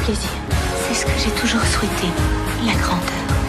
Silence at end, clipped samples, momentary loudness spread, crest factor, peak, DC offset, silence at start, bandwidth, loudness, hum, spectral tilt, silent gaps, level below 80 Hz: 0 s; under 0.1%; 4 LU; 12 dB; -6 dBFS; under 0.1%; 0 s; 15 kHz; -19 LUFS; none; -4 dB/octave; none; -26 dBFS